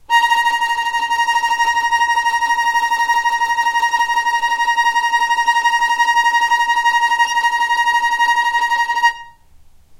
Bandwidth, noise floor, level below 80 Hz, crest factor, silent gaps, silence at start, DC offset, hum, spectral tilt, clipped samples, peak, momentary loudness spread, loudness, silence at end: 16 kHz; -44 dBFS; -52 dBFS; 14 dB; none; 0.1 s; under 0.1%; none; 2 dB/octave; under 0.1%; -2 dBFS; 3 LU; -15 LUFS; 0.05 s